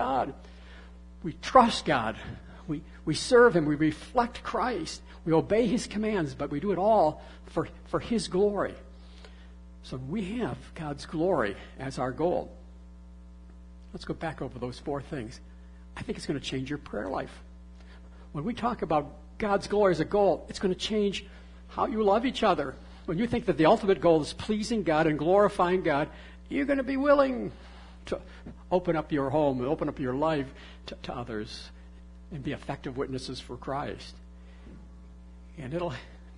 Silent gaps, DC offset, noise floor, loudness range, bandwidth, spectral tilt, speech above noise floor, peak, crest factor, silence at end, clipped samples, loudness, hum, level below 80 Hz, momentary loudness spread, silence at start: none; under 0.1%; -48 dBFS; 12 LU; 11 kHz; -6 dB/octave; 20 dB; -6 dBFS; 24 dB; 0 s; under 0.1%; -28 LUFS; none; -48 dBFS; 20 LU; 0 s